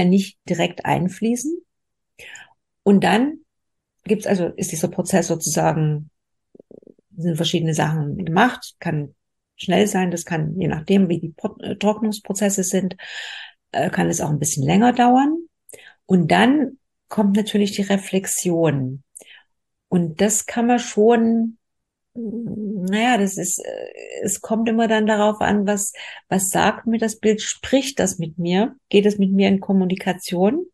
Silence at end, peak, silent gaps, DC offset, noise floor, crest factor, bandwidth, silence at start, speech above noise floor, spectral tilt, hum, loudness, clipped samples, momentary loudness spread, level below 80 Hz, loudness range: 0.1 s; -2 dBFS; none; under 0.1%; -82 dBFS; 18 dB; 12.5 kHz; 0 s; 62 dB; -5 dB/octave; none; -20 LUFS; under 0.1%; 12 LU; -56 dBFS; 4 LU